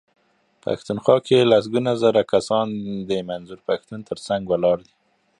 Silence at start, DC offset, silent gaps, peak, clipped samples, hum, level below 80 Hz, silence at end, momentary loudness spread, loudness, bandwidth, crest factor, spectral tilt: 0.65 s; under 0.1%; none; -2 dBFS; under 0.1%; none; -58 dBFS; 0.6 s; 14 LU; -21 LUFS; 11 kHz; 20 dB; -6 dB/octave